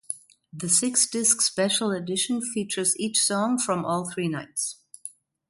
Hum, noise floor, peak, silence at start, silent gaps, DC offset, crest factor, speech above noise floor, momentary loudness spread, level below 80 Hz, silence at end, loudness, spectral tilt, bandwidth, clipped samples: none; -46 dBFS; -6 dBFS; 0.1 s; none; under 0.1%; 20 dB; 21 dB; 16 LU; -70 dBFS; 0.4 s; -23 LUFS; -2.5 dB/octave; 12 kHz; under 0.1%